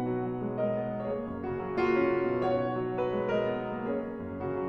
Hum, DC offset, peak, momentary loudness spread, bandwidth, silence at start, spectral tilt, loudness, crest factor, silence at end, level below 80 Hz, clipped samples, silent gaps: none; under 0.1%; -16 dBFS; 8 LU; 6.2 kHz; 0 s; -9 dB/octave; -31 LUFS; 14 dB; 0 s; -56 dBFS; under 0.1%; none